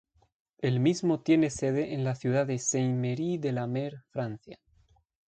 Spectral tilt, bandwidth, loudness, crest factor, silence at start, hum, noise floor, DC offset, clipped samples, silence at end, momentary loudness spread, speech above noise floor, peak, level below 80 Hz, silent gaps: -6 dB/octave; 9.2 kHz; -29 LUFS; 18 dB; 0.6 s; none; -65 dBFS; under 0.1%; under 0.1%; 0.75 s; 11 LU; 37 dB; -12 dBFS; -64 dBFS; none